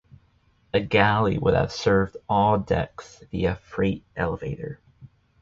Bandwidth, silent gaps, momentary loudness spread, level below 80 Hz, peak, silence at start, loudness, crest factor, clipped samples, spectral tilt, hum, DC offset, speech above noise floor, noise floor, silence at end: 7.6 kHz; none; 15 LU; -44 dBFS; -2 dBFS; 0.75 s; -24 LUFS; 22 dB; under 0.1%; -6.5 dB/octave; none; under 0.1%; 39 dB; -62 dBFS; 0.35 s